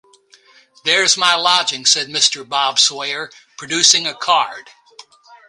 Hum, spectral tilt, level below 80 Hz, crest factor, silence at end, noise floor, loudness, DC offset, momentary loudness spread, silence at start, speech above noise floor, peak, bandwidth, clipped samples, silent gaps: none; 0.5 dB/octave; -68 dBFS; 18 dB; 0.15 s; -50 dBFS; -14 LUFS; under 0.1%; 13 LU; 0.85 s; 34 dB; 0 dBFS; 16 kHz; under 0.1%; none